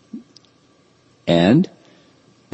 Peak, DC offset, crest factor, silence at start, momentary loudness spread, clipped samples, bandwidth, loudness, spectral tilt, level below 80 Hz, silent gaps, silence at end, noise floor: -2 dBFS; under 0.1%; 18 dB; 0.15 s; 25 LU; under 0.1%; 8.4 kHz; -17 LUFS; -7.5 dB/octave; -56 dBFS; none; 0.85 s; -56 dBFS